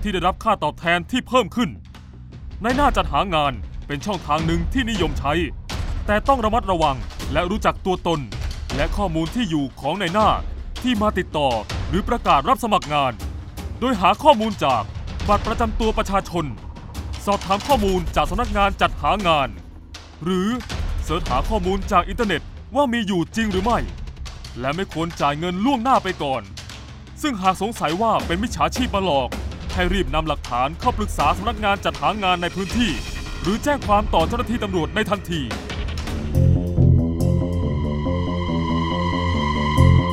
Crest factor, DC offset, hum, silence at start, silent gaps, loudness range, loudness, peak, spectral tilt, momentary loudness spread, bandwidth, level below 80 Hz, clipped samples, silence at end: 20 dB; under 0.1%; none; 0 s; none; 2 LU; -21 LUFS; 0 dBFS; -6 dB/octave; 10 LU; 16 kHz; -30 dBFS; under 0.1%; 0 s